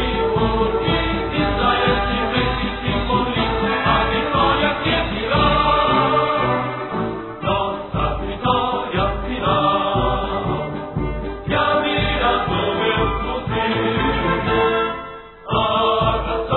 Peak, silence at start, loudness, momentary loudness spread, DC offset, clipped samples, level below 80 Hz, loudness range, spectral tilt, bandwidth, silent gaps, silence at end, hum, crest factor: -4 dBFS; 0 s; -19 LUFS; 8 LU; under 0.1%; under 0.1%; -30 dBFS; 3 LU; -9 dB/octave; 4.2 kHz; none; 0 s; none; 16 dB